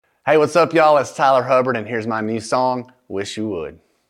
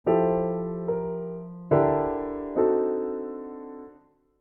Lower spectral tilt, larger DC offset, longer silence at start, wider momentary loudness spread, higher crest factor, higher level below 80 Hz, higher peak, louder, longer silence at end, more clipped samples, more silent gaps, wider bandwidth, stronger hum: second, -5 dB/octave vs -12 dB/octave; neither; first, 0.25 s vs 0.05 s; about the same, 14 LU vs 16 LU; about the same, 16 dB vs 18 dB; second, -62 dBFS vs -54 dBFS; first, -2 dBFS vs -8 dBFS; first, -18 LUFS vs -26 LUFS; second, 0.35 s vs 0.5 s; neither; neither; first, 12.5 kHz vs 3 kHz; neither